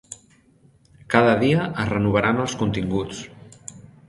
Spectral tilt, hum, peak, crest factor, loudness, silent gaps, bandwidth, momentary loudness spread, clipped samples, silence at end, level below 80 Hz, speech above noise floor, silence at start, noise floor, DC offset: -6 dB/octave; none; 0 dBFS; 22 dB; -21 LUFS; none; 11.5 kHz; 23 LU; under 0.1%; 0.25 s; -48 dBFS; 36 dB; 0.1 s; -56 dBFS; under 0.1%